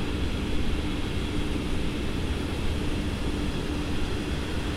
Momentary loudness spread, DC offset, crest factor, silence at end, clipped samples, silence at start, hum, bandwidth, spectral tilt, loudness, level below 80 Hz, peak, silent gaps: 1 LU; under 0.1%; 12 dB; 0 s; under 0.1%; 0 s; none; 14 kHz; -6 dB/octave; -30 LUFS; -32 dBFS; -14 dBFS; none